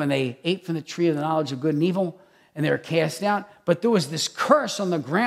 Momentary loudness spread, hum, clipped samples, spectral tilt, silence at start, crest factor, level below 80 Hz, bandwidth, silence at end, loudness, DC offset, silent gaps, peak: 7 LU; none; under 0.1%; -5.5 dB/octave; 0 s; 20 dB; -72 dBFS; 15 kHz; 0 s; -24 LUFS; under 0.1%; none; -4 dBFS